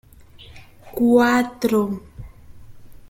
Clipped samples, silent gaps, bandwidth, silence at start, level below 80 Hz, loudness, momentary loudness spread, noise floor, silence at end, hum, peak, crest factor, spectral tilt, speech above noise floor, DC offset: under 0.1%; none; 17 kHz; 0.5 s; -48 dBFS; -19 LUFS; 16 LU; -45 dBFS; 0.15 s; none; -4 dBFS; 18 dB; -5.5 dB/octave; 27 dB; under 0.1%